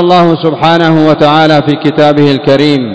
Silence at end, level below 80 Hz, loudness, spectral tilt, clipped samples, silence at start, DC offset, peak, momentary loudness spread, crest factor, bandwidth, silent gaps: 0 s; -46 dBFS; -7 LUFS; -7 dB/octave; 6%; 0 s; 2%; 0 dBFS; 3 LU; 6 dB; 8 kHz; none